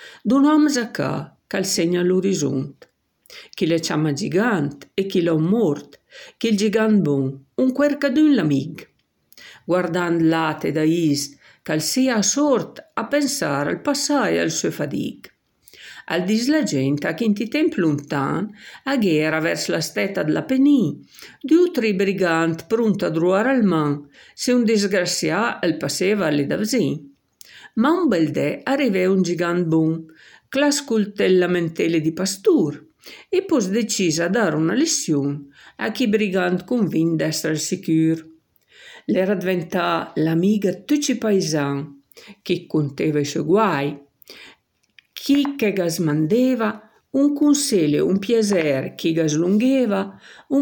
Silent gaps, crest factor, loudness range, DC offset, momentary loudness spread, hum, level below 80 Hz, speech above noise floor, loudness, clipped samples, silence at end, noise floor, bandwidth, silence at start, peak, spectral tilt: none; 14 dB; 3 LU; under 0.1%; 9 LU; none; -66 dBFS; 37 dB; -20 LUFS; under 0.1%; 0 s; -57 dBFS; 17.5 kHz; 0 s; -6 dBFS; -5 dB/octave